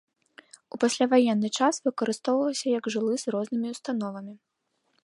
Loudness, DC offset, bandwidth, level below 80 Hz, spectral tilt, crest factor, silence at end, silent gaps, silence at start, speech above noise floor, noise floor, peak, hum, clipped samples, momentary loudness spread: -26 LUFS; under 0.1%; 11.5 kHz; -80 dBFS; -4 dB/octave; 18 dB; 0.65 s; none; 0.75 s; 49 dB; -75 dBFS; -8 dBFS; none; under 0.1%; 11 LU